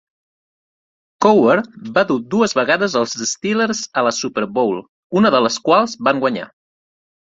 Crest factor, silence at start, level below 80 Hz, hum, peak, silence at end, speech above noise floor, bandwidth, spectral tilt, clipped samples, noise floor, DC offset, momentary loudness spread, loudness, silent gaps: 16 dB; 1.2 s; -60 dBFS; none; 0 dBFS; 0.85 s; over 74 dB; 7.8 kHz; -4 dB/octave; under 0.1%; under -90 dBFS; under 0.1%; 7 LU; -17 LUFS; 4.89-5.10 s